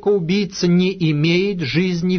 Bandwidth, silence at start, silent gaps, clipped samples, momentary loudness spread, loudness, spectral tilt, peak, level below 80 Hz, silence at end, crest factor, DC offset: 6.6 kHz; 0 s; none; under 0.1%; 3 LU; -18 LUFS; -6.5 dB/octave; -6 dBFS; -50 dBFS; 0 s; 12 dB; under 0.1%